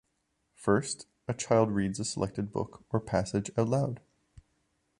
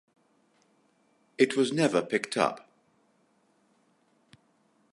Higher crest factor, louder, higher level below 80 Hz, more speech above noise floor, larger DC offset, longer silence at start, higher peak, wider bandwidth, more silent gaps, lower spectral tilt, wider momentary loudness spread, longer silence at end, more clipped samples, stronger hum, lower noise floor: about the same, 22 dB vs 24 dB; second, -31 LUFS vs -27 LUFS; first, -56 dBFS vs -82 dBFS; first, 48 dB vs 42 dB; neither; second, 0.6 s vs 1.4 s; about the same, -10 dBFS vs -8 dBFS; about the same, 11 kHz vs 11.5 kHz; neither; about the same, -5.5 dB/octave vs -4.5 dB/octave; about the same, 11 LU vs 13 LU; second, 1 s vs 2.35 s; neither; neither; first, -78 dBFS vs -69 dBFS